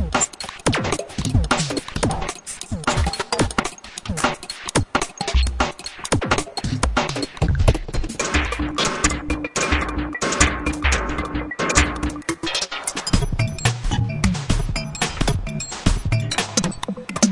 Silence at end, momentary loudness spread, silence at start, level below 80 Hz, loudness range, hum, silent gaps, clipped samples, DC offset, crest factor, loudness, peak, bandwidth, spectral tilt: 0 s; 7 LU; 0 s; -28 dBFS; 2 LU; none; none; under 0.1%; under 0.1%; 22 dB; -22 LUFS; 0 dBFS; 11.5 kHz; -4 dB/octave